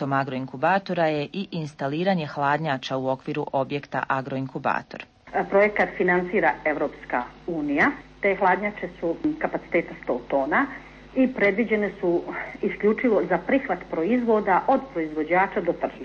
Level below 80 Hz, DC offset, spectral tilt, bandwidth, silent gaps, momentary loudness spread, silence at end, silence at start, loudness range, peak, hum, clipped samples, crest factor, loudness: -54 dBFS; under 0.1%; -7.5 dB/octave; 7.2 kHz; none; 9 LU; 0 s; 0 s; 3 LU; -8 dBFS; none; under 0.1%; 16 dB; -24 LUFS